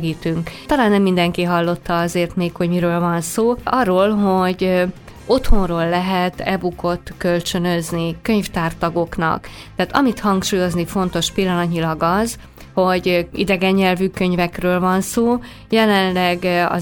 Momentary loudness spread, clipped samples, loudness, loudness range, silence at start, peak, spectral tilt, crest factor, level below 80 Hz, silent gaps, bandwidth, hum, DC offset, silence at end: 7 LU; under 0.1%; -18 LUFS; 3 LU; 0 s; 0 dBFS; -5.5 dB/octave; 16 dB; -32 dBFS; none; 18.5 kHz; none; under 0.1%; 0 s